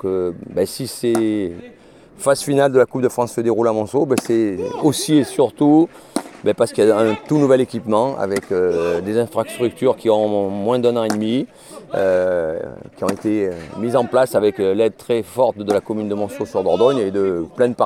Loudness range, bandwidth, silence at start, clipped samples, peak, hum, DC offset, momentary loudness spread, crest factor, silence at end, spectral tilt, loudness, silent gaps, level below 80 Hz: 3 LU; 16.5 kHz; 0.05 s; under 0.1%; -2 dBFS; none; under 0.1%; 8 LU; 16 dB; 0 s; -6 dB/octave; -18 LUFS; none; -56 dBFS